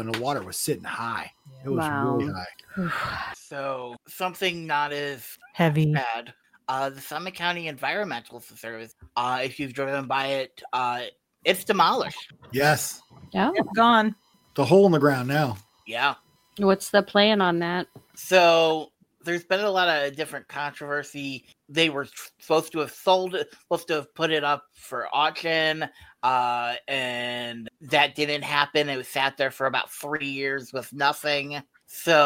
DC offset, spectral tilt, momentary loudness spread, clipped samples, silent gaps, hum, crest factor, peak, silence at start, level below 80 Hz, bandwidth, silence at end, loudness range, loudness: under 0.1%; -4.5 dB/octave; 15 LU; under 0.1%; none; none; 22 dB; -2 dBFS; 0 s; -64 dBFS; 17 kHz; 0 s; 7 LU; -25 LUFS